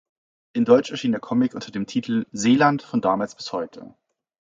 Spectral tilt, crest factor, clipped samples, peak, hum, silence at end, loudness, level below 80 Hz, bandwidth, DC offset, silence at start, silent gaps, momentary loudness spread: -5.5 dB/octave; 20 dB; under 0.1%; -2 dBFS; none; 0.75 s; -22 LUFS; -64 dBFS; 7.8 kHz; under 0.1%; 0.55 s; none; 12 LU